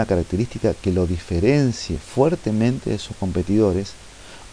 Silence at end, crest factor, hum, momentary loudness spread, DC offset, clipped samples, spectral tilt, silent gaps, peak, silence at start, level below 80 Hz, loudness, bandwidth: 0 s; 18 dB; none; 9 LU; under 0.1%; under 0.1%; -7 dB/octave; none; -4 dBFS; 0 s; -38 dBFS; -21 LUFS; 10.5 kHz